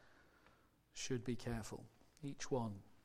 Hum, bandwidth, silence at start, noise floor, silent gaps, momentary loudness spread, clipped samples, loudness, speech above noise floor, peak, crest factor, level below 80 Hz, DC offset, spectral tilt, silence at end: none; 15.5 kHz; 0 s; -72 dBFS; none; 13 LU; under 0.1%; -46 LUFS; 28 dB; -28 dBFS; 18 dB; -62 dBFS; under 0.1%; -5 dB/octave; 0.05 s